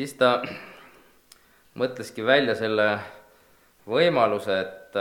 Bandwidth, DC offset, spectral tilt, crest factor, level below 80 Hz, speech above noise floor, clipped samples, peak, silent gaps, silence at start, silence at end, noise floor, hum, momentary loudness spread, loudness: 18 kHz; under 0.1%; -5 dB/octave; 20 dB; -70 dBFS; 35 dB; under 0.1%; -4 dBFS; none; 0 s; 0 s; -58 dBFS; none; 14 LU; -24 LUFS